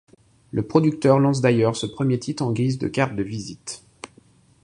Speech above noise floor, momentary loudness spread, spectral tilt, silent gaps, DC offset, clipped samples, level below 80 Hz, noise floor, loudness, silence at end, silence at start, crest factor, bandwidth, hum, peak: 34 dB; 18 LU; -6.5 dB/octave; none; under 0.1%; under 0.1%; -54 dBFS; -55 dBFS; -22 LUFS; 0.55 s; 0.55 s; 20 dB; 11 kHz; none; -2 dBFS